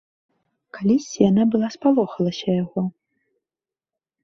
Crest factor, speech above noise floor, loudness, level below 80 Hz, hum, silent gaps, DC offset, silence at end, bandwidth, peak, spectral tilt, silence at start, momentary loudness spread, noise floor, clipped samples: 18 dB; over 70 dB; -21 LUFS; -60 dBFS; none; none; under 0.1%; 1.35 s; 7.6 kHz; -4 dBFS; -7 dB/octave; 0.75 s; 9 LU; under -90 dBFS; under 0.1%